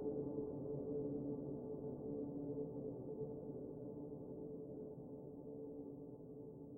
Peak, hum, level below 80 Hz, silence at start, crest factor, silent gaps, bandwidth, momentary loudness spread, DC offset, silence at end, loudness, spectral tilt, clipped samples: -32 dBFS; none; -70 dBFS; 0 s; 14 dB; none; 1.5 kHz; 9 LU; under 0.1%; 0 s; -48 LUFS; -12.5 dB/octave; under 0.1%